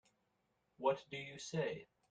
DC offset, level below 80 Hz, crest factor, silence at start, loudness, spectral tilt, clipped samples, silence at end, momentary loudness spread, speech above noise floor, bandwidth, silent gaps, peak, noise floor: under 0.1%; -80 dBFS; 22 dB; 0.8 s; -42 LUFS; -5 dB/octave; under 0.1%; 0.25 s; 9 LU; 41 dB; 9 kHz; none; -22 dBFS; -82 dBFS